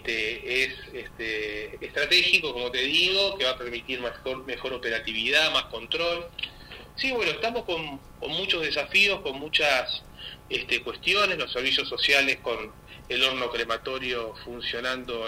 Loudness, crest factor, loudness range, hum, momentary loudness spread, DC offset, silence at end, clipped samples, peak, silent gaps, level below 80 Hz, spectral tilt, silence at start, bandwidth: -25 LUFS; 22 dB; 3 LU; none; 14 LU; under 0.1%; 0 s; under 0.1%; -6 dBFS; none; -52 dBFS; -2 dB/octave; 0 s; 16 kHz